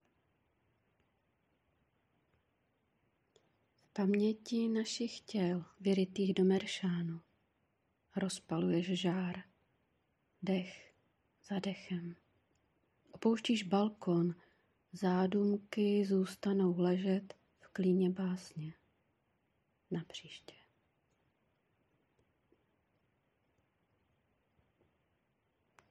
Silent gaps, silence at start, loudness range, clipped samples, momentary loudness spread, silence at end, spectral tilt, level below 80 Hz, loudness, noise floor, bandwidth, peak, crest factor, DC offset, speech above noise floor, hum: none; 3.95 s; 14 LU; under 0.1%; 15 LU; 5.55 s; -6.5 dB/octave; -82 dBFS; -36 LUFS; -80 dBFS; 11.5 kHz; -20 dBFS; 20 dB; under 0.1%; 45 dB; none